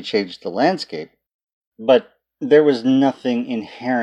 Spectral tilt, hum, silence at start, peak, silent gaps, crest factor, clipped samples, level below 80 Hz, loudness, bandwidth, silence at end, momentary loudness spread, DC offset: -6 dB/octave; none; 0 s; -2 dBFS; 1.34-1.47 s, 1.53-1.61 s, 1.67-1.72 s; 16 dB; under 0.1%; -70 dBFS; -18 LUFS; 8.6 kHz; 0 s; 15 LU; under 0.1%